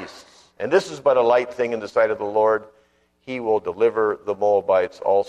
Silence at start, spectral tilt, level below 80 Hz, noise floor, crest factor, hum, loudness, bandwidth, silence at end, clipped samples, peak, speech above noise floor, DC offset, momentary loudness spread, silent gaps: 0 s; -5 dB/octave; -64 dBFS; -47 dBFS; 16 dB; none; -21 LUFS; 10.5 kHz; 0 s; under 0.1%; -4 dBFS; 27 dB; under 0.1%; 7 LU; none